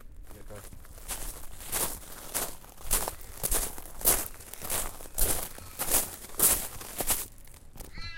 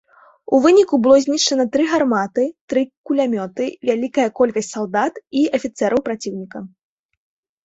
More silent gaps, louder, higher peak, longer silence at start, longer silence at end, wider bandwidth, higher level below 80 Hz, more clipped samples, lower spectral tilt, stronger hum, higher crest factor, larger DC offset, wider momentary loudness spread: second, none vs 2.61-2.68 s, 2.97-3.04 s; second, -29 LUFS vs -18 LUFS; second, -8 dBFS vs -2 dBFS; second, 0 s vs 0.5 s; second, 0 s vs 0.95 s; first, 17 kHz vs 8 kHz; first, -40 dBFS vs -60 dBFS; neither; second, -1.5 dB/octave vs -4 dB/octave; neither; first, 24 dB vs 16 dB; neither; first, 22 LU vs 11 LU